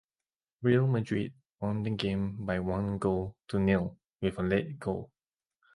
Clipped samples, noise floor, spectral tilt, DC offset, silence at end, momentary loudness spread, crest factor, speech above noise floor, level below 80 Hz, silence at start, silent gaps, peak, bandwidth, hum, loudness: under 0.1%; under -90 dBFS; -8 dB/octave; under 0.1%; 0.7 s; 9 LU; 18 dB; over 60 dB; -52 dBFS; 0.6 s; 1.54-1.58 s, 4.09-4.19 s; -12 dBFS; 11.5 kHz; none; -32 LUFS